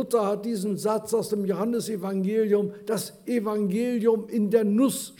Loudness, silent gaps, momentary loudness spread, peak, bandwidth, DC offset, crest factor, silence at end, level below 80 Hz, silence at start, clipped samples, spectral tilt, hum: -26 LUFS; none; 6 LU; -8 dBFS; 19 kHz; under 0.1%; 16 dB; 0.1 s; -74 dBFS; 0 s; under 0.1%; -6 dB/octave; none